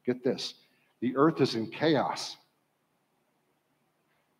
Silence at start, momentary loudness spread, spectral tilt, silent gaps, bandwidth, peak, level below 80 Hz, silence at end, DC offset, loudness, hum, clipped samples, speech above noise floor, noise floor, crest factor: 0.05 s; 13 LU; -5.5 dB/octave; none; 14 kHz; -12 dBFS; -80 dBFS; 2.05 s; under 0.1%; -29 LUFS; none; under 0.1%; 46 dB; -75 dBFS; 20 dB